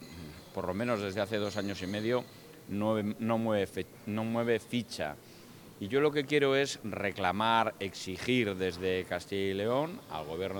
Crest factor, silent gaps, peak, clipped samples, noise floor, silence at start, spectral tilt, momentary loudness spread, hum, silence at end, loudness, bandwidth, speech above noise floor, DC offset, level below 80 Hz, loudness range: 22 dB; none; -12 dBFS; under 0.1%; -52 dBFS; 0 s; -5.5 dB/octave; 13 LU; none; 0 s; -32 LUFS; 19.5 kHz; 20 dB; under 0.1%; -68 dBFS; 3 LU